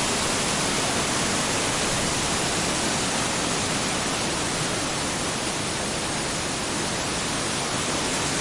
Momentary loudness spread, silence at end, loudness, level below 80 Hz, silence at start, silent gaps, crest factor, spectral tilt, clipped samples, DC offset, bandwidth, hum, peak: 3 LU; 0 s; -24 LUFS; -44 dBFS; 0 s; none; 14 dB; -2.5 dB/octave; under 0.1%; under 0.1%; 11.5 kHz; none; -12 dBFS